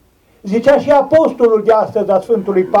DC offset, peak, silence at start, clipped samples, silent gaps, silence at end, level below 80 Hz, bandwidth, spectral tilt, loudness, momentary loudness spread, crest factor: under 0.1%; -2 dBFS; 0.45 s; under 0.1%; none; 0 s; -52 dBFS; 11.5 kHz; -7 dB/octave; -13 LUFS; 5 LU; 10 dB